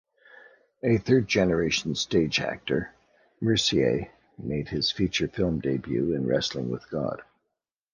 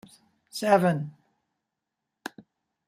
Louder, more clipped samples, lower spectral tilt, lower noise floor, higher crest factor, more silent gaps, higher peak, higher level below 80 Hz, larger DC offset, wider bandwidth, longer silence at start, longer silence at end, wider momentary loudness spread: about the same, -26 LUFS vs -24 LUFS; neither; about the same, -5 dB/octave vs -6 dB/octave; about the same, -83 dBFS vs -85 dBFS; about the same, 20 dB vs 22 dB; neither; about the same, -8 dBFS vs -8 dBFS; first, -50 dBFS vs -74 dBFS; neither; second, 10 kHz vs 15.5 kHz; first, 0.85 s vs 0.55 s; second, 0.7 s vs 1.8 s; second, 10 LU vs 20 LU